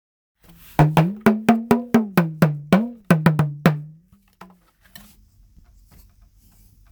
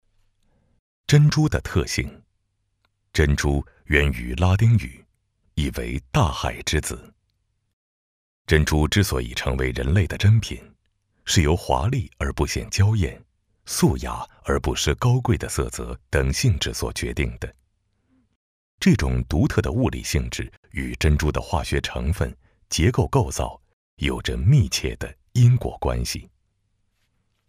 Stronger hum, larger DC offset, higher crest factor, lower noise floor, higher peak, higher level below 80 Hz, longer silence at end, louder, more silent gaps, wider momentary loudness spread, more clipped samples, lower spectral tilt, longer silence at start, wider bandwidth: neither; neither; about the same, 20 dB vs 22 dB; second, -54 dBFS vs -72 dBFS; about the same, 0 dBFS vs -2 dBFS; second, -46 dBFS vs -32 dBFS; first, 3 s vs 1.25 s; first, -19 LUFS vs -22 LUFS; second, none vs 7.73-8.45 s, 18.36-18.78 s, 20.57-20.63 s, 23.73-23.97 s; second, 4 LU vs 12 LU; neither; first, -7.5 dB/octave vs -5.5 dB/octave; second, 0.8 s vs 1.1 s; first, over 20 kHz vs 15.5 kHz